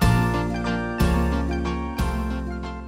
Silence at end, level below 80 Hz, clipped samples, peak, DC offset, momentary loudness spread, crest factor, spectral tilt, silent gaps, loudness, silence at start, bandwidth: 0 s; -28 dBFS; under 0.1%; -8 dBFS; under 0.1%; 7 LU; 14 dB; -6.5 dB/octave; none; -24 LUFS; 0 s; 16 kHz